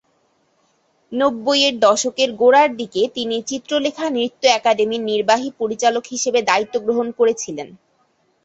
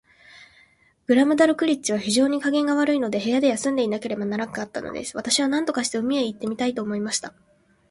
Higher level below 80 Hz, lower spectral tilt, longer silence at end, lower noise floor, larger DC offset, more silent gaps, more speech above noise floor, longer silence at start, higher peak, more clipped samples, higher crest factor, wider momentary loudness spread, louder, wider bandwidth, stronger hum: about the same, -64 dBFS vs -64 dBFS; second, -2 dB/octave vs -3.5 dB/octave; about the same, 0.7 s vs 0.6 s; first, -63 dBFS vs -58 dBFS; neither; neither; first, 45 dB vs 36 dB; first, 1.1 s vs 0.35 s; first, 0 dBFS vs -4 dBFS; neither; about the same, 18 dB vs 20 dB; about the same, 9 LU vs 11 LU; first, -18 LUFS vs -23 LUFS; second, 8.2 kHz vs 11.5 kHz; neither